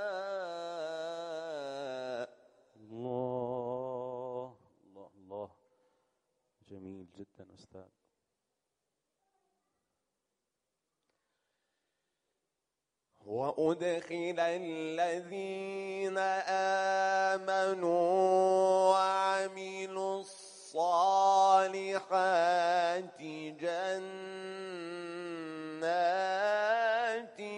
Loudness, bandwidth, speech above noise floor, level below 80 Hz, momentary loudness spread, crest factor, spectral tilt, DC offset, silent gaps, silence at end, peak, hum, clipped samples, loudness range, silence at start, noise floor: -32 LUFS; 10.5 kHz; 57 dB; -86 dBFS; 16 LU; 20 dB; -4 dB/octave; under 0.1%; none; 0 s; -14 dBFS; none; under 0.1%; 15 LU; 0 s; -88 dBFS